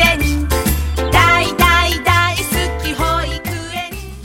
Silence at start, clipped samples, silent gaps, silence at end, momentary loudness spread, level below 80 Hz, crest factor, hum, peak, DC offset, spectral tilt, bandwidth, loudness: 0 s; under 0.1%; none; 0 s; 12 LU; -22 dBFS; 16 dB; none; 0 dBFS; under 0.1%; -4 dB/octave; 17 kHz; -15 LUFS